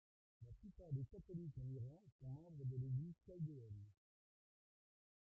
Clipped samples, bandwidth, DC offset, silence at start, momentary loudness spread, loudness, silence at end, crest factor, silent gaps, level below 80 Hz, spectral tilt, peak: under 0.1%; 1 kHz; under 0.1%; 0.4 s; 14 LU; -52 LUFS; 1.45 s; 16 dB; 2.12-2.19 s; -72 dBFS; -13.5 dB/octave; -36 dBFS